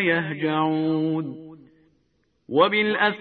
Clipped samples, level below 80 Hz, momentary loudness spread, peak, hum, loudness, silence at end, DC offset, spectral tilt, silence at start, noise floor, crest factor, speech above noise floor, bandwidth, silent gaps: under 0.1%; -68 dBFS; 10 LU; -4 dBFS; none; -22 LUFS; 0 s; under 0.1%; -9.5 dB/octave; 0 s; -68 dBFS; 20 dB; 46 dB; 4.6 kHz; none